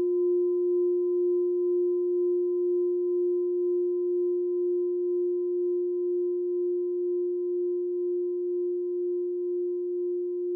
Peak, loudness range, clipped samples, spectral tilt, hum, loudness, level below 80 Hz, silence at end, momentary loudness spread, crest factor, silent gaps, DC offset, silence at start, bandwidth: -20 dBFS; 3 LU; under 0.1%; 2 dB/octave; none; -28 LUFS; under -90 dBFS; 0 s; 4 LU; 6 dB; none; under 0.1%; 0 s; 1.1 kHz